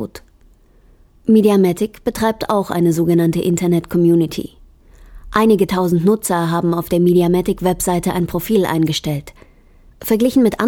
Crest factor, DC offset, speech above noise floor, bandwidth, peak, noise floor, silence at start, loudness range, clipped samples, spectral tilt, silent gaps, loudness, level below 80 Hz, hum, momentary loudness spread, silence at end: 14 dB; under 0.1%; 34 dB; 18.5 kHz; -2 dBFS; -49 dBFS; 0 s; 2 LU; under 0.1%; -6.5 dB/octave; none; -16 LUFS; -42 dBFS; none; 8 LU; 0 s